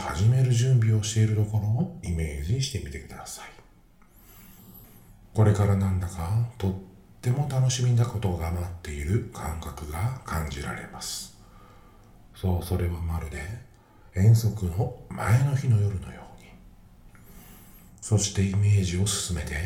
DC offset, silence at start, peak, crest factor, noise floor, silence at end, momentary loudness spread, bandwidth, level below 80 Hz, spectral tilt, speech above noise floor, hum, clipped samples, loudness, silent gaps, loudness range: under 0.1%; 0 s; -8 dBFS; 18 dB; -55 dBFS; 0 s; 15 LU; 15.5 kHz; -44 dBFS; -5.5 dB/octave; 30 dB; none; under 0.1%; -26 LUFS; none; 7 LU